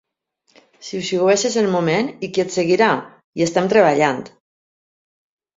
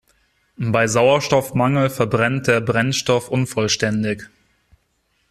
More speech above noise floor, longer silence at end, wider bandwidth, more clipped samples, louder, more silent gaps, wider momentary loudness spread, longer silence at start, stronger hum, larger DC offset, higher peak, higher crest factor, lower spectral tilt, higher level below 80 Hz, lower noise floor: about the same, 48 dB vs 48 dB; first, 1.3 s vs 1.05 s; second, 7.8 kHz vs 14 kHz; neither; about the same, -18 LUFS vs -18 LUFS; first, 3.24-3.33 s vs none; first, 13 LU vs 7 LU; first, 0.8 s vs 0.6 s; neither; neither; about the same, -2 dBFS vs -2 dBFS; about the same, 18 dB vs 16 dB; about the same, -4.5 dB/octave vs -5 dB/octave; second, -62 dBFS vs -52 dBFS; about the same, -66 dBFS vs -66 dBFS